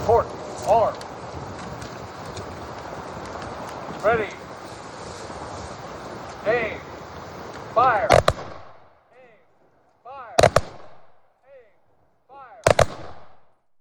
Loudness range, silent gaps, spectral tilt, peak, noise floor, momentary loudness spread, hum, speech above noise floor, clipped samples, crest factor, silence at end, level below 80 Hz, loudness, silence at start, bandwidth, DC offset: 6 LU; none; -4.5 dB/octave; -4 dBFS; -64 dBFS; 19 LU; none; 44 dB; under 0.1%; 22 dB; 0.35 s; -44 dBFS; -24 LUFS; 0 s; over 20 kHz; under 0.1%